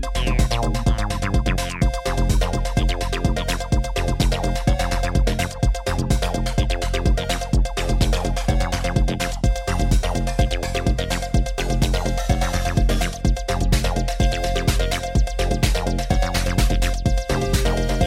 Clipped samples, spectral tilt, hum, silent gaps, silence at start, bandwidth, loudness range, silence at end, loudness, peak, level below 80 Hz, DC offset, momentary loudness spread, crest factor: under 0.1%; -5 dB/octave; none; none; 0 s; 15.5 kHz; 1 LU; 0 s; -22 LUFS; -4 dBFS; -22 dBFS; under 0.1%; 2 LU; 16 dB